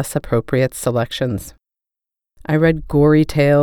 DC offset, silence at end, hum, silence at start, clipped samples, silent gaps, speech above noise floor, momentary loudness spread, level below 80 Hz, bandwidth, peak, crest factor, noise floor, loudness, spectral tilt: under 0.1%; 0 s; none; 0 s; under 0.1%; none; 71 dB; 11 LU; -38 dBFS; 19 kHz; -2 dBFS; 14 dB; -87 dBFS; -17 LUFS; -6.5 dB/octave